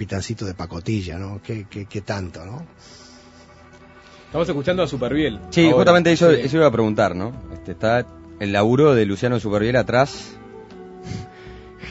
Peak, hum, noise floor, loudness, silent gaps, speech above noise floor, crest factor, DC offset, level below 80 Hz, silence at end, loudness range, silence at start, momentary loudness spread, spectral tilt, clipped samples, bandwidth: -2 dBFS; none; -46 dBFS; -19 LUFS; none; 27 dB; 18 dB; under 0.1%; -46 dBFS; 0 s; 13 LU; 0 s; 23 LU; -6.5 dB/octave; under 0.1%; 8 kHz